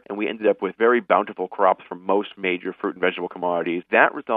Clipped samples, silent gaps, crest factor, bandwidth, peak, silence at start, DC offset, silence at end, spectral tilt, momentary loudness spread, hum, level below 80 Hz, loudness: under 0.1%; none; 22 dB; 3.9 kHz; 0 dBFS; 0.1 s; under 0.1%; 0 s; -8.5 dB/octave; 9 LU; none; -76 dBFS; -22 LUFS